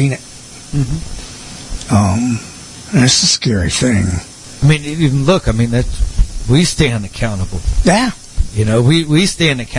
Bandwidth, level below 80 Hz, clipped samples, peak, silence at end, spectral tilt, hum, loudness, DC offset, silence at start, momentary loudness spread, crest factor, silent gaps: 11.5 kHz; -24 dBFS; under 0.1%; 0 dBFS; 0 s; -4.5 dB/octave; none; -14 LUFS; under 0.1%; 0 s; 17 LU; 14 dB; none